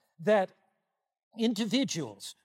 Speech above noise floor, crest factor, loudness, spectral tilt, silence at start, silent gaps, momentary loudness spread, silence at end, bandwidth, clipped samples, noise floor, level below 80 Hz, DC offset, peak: 52 dB; 18 dB; -30 LUFS; -4.5 dB/octave; 0.2 s; 1.23-1.31 s; 10 LU; 0.1 s; 16 kHz; under 0.1%; -82 dBFS; -86 dBFS; under 0.1%; -14 dBFS